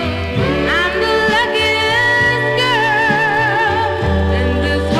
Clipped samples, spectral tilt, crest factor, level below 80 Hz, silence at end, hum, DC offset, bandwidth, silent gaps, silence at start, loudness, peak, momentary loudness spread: under 0.1%; -5 dB/octave; 12 dB; -28 dBFS; 0 s; none; 0.2%; 15.5 kHz; none; 0 s; -14 LUFS; -2 dBFS; 4 LU